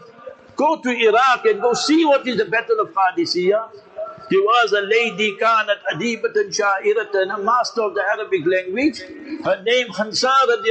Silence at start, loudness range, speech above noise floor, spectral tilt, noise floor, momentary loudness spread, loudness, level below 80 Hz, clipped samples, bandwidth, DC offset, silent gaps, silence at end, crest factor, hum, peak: 0 s; 3 LU; 22 dB; -3.5 dB/octave; -40 dBFS; 7 LU; -18 LUFS; -66 dBFS; under 0.1%; 9 kHz; under 0.1%; none; 0 s; 12 dB; none; -6 dBFS